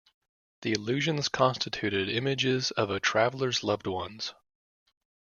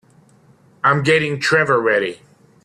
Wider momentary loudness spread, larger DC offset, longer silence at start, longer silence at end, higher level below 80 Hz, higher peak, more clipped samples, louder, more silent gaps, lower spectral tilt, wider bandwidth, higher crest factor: first, 9 LU vs 5 LU; neither; second, 0.6 s vs 0.85 s; first, 1 s vs 0.5 s; second, -66 dBFS vs -58 dBFS; second, -8 dBFS vs -2 dBFS; neither; second, -29 LUFS vs -16 LUFS; neither; about the same, -4 dB/octave vs -5 dB/octave; second, 7.4 kHz vs 12.5 kHz; first, 22 dB vs 16 dB